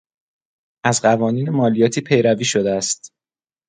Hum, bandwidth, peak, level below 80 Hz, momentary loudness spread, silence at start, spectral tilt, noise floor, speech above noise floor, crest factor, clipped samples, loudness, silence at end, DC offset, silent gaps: none; 9.6 kHz; 0 dBFS; -58 dBFS; 6 LU; 0.85 s; -4.5 dB/octave; under -90 dBFS; over 73 dB; 18 dB; under 0.1%; -18 LUFS; 0.6 s; under 0.1%; none